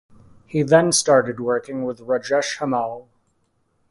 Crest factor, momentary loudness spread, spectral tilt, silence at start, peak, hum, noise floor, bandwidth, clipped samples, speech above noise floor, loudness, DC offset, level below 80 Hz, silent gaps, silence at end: 20 dB; 13 LU; -4 dB/octave; 0.55 s; 0 dBFS; none; -67 dBFS; 11.5 kHz; under 0.1%; 47 dB; -20 LUFS; under 0.1%; -60 dBFS; none; 0.9 s